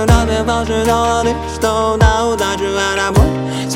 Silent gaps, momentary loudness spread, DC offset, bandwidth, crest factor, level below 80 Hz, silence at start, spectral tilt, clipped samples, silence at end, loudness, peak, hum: none; 4 LU; under 0.1%; 16.5 kHz; 14 dB; -22 dBFS; 0 s; -5 dB/octave; under 0.1%; 0 s; -14 LUFS; 0 dBFS; none